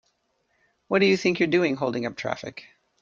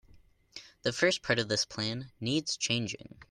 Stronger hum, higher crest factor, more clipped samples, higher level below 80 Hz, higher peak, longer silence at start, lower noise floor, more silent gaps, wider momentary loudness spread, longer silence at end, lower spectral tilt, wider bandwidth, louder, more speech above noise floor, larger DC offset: neither; about the same, 18 dB vs 22 dB; neither; about the same, -66 dBFS vs -64 dBFS; first, -8 dBFS vs -12 dBFS; first, 0.9 s vs 0.15 s; first, -71 dBFS vs -60 dBFS; neither; second, 14 LU vs 17 LU; first, 0.4 s vs 0.1 s; first, -5.5 dB/octave vs -3.5 dB/octave; second, 7.4 kHz vs 12 kHz; first, -24 LUFS vs -31 LUFS; first, 48 dB vs 28 dB; neither